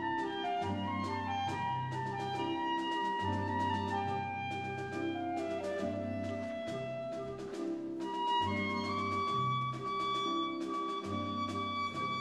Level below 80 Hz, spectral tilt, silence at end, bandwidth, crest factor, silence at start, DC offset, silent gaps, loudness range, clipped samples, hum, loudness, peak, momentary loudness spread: -70 dBFS; -6 dB/octave; 0 s; 12.5 kHz; 14 dB; 0 s; under 0.1%; none; 4 LU; under 0.1%; none; -36 LUFS; -22 dBFS; 6 LU